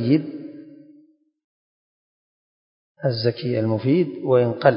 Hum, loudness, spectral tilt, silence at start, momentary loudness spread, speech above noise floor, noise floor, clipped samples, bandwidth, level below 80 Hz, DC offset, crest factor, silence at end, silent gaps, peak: none; -21 LUFS; -11.5 dB/octave; 0 s; 17 LU; 36 dB; -56 dBFS; under 0.1%; 5.4 kHz; -64 dBFS; under 0.1%; 22 dB; 0 s; 1.44-2.95 s; -2 dBFS